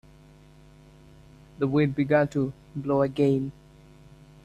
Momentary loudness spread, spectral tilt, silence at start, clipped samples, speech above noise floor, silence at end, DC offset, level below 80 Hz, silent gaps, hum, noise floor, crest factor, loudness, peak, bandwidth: 9 LU; -8.5 dB/octave; 1.6 s; under 0.1%; 28 dB; 0.95 s; under 0.1%; -56 dBFS; none; none; -52 dBFS; 20 dB; -26 LUFS; -8 dBFS; 8.8 kHz